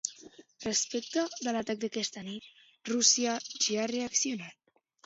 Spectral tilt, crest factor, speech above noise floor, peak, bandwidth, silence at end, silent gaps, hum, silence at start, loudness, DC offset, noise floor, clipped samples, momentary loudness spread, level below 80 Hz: -1.5 dB/octave; 24 dB; 22 dB; -10 dBFS; 8 kHz; 0.55 s; none; none; 0.05 s; -30 LUFS; under 0.1%; -54 dBFS; under 0.1%; 17 LU; -74 dBFS